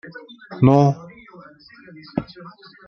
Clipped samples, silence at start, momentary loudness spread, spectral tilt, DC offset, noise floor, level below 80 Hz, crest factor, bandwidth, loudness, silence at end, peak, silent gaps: under 0.1%; 0.15 s; 27 LU; -9 dB/octave; under 0.1%; -46 dBFS; -52 dBFS; 22 dB; 6.4 kHz; -18 LUFS; 0.4 s; 0 dBFS; none